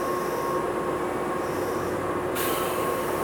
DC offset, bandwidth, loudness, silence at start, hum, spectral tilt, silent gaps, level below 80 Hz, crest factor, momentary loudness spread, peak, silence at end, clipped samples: under 0.1%; over 20 kHz; -27 LUFS; 0 s; none; -4.5 dB/octave; none; -52 dBFS; 12 dB; 2 LU; -14 dBFS; 0 s; under 0.1%